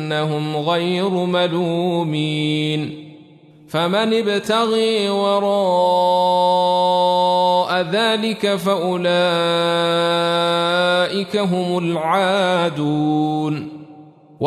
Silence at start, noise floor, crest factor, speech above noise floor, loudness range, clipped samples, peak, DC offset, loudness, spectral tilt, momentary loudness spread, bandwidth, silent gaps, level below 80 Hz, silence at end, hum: 0 s; -45 dBFS; 12 dB; 28 dB; 4 LU; under 0.1%; -6 dBFS; under 0.1%; -18 LUFS; -5.5 dB/octave; 5 LU; 13.5 kHz; none; -66 dBFS; 0 s; none